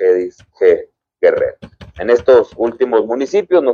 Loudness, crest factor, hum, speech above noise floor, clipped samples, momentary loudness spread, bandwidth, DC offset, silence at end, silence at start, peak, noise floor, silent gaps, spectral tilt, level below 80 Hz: -14 LUFS; 14 dB; none; 19 dB; under 0.1%; 8 LU; 7 kHz; under 0.1%; 0 s; 0 s; 0 dBFS; -32 dBFS; none; -6 dB/octave; -48 dBFS